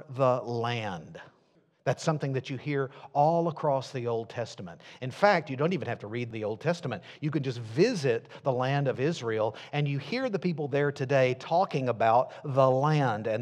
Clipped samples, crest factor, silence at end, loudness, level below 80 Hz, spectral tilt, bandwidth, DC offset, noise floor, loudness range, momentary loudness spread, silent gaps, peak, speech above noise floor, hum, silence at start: under 0.1%; 22 dB; 0 s; -29 LUFS; -76 dBFS; -6.5 dB/octave; 10 kHz; under 0.1%; -66 dBFS; 4 LU; 10 LU; none; -6 dBFS; 38 dB; none; 0 s